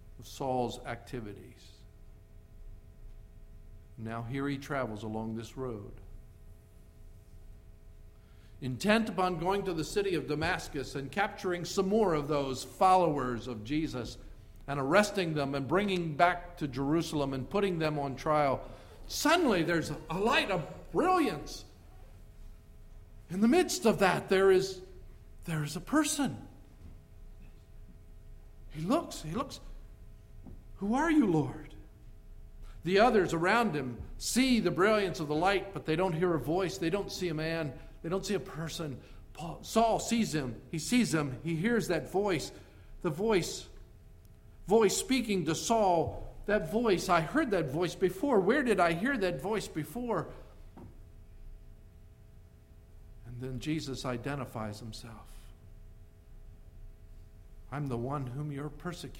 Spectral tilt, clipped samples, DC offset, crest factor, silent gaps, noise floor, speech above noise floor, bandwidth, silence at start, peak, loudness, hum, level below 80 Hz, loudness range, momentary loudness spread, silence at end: -5 dB/octave; under 0.1%; under 0.1%; 24 dB; none; -55 dBFS; 25 dB; 16.5 kHz; 0 s; -10 dBFS; -31 LUFS; none; -50 dBFS; 12 LU; 15 LU; 0 s